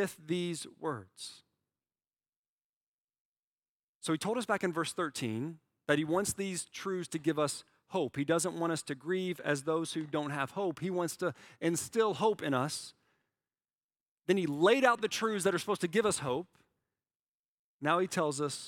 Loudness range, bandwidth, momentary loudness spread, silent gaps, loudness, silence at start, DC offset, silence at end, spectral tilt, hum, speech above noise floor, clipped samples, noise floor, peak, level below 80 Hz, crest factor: 8 LU; 17 kHz; 10 LU; 2.36-2.58 s, 2.64-3.08 s, 3.19-4.00 s, 13.83-13.89 s, 14.00-14.18 s, 17.15-17.79 s; -33 LUFS; 0 s; under 0.1%; 0 s; -4.5 dB/octave; none; over 57 dB; under 0.1%; under -90 dBFS; -12 dBFS; -74 dBFS; 22 dB